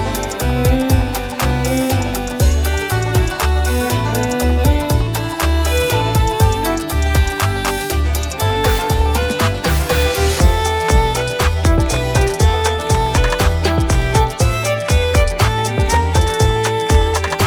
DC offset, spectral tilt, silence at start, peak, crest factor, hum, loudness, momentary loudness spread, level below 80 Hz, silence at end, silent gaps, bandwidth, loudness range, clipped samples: under 0.1%; -5 dB/octave; 0 s; 0 dBFS; 14 dB; none; -16 LUFS; 4 LU; -20 dBFS; 0 s; none; over 20 kHz; 2 LU; under 0.1%